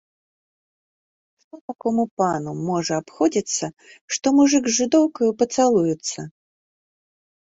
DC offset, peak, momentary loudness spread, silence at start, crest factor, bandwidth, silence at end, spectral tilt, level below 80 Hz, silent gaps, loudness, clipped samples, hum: under 0.1%; -6 dBFS; 13 LU; 1.55 s; 18 dB; 8 kHz; 1.25 s; -4.5 dB/octave; -64 dBFS; 1.61-1.68 s, 2.11-2.17 s, 4.01-4.08 s; -21 LUFS; under 0.1%; none